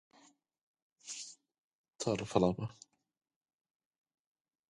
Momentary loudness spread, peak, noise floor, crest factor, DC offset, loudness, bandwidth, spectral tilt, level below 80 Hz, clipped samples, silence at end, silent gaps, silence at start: 16 LU; -14 dBFS; -67 dBFS; 28 dB; under 0.1%; -36 LUFS; 11 kHz; -5.5 dB/octave; -66 dBFS; under 0.1%; 2 s; 1.58-1.84 s; 1.05 s